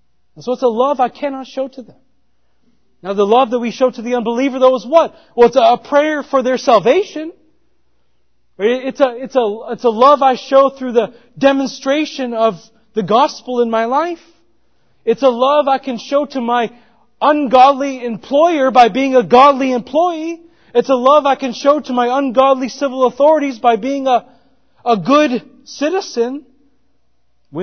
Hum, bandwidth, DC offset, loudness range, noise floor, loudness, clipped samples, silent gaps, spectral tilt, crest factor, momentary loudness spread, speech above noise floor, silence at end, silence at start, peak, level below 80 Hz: none; 6.6 kHz; 0.2%; 6 LU; -66 dBFS; -14 LUFS; under 0.1%; none; -5 dB/octave; 14 dB; 13 LU; 52 dB; 0 s; 0.35 s; 0 dBFS; -60 dBFS